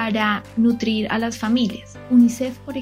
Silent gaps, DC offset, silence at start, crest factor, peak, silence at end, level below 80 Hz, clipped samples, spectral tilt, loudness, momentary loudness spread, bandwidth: none; under 0.1%; 0 s; 14 dB; -6 dBFS; 0 s; -52 dBFS; under 0.1%; -5 dB/octave; -20 LUFS; 10 LU; 15 kHz